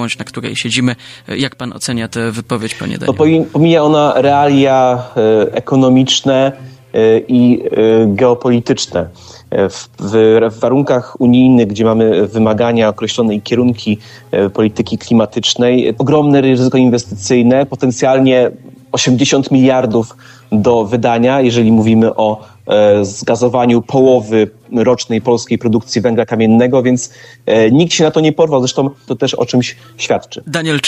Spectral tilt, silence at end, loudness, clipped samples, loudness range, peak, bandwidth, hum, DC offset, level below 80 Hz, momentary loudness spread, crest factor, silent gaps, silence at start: -5.5 dB/octave; 0 s; -12 LUFS; under 0.1%; 2 LU; 0 dBFS; 11.5 kHz; none; under 0.1%; -50 dBFS; 9 LU; 12 dB; none; 0 s